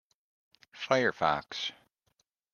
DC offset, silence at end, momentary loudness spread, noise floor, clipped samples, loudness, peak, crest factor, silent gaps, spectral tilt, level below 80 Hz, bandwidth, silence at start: under 0.1%; 0.85 s; 11 LU; -77 dBFS; under 0.1%; -30 LUFS; -10 dBFS; 24 dB; none; -4 dB/octave; -70 dBFS; 9.8 kHz; 0.75 s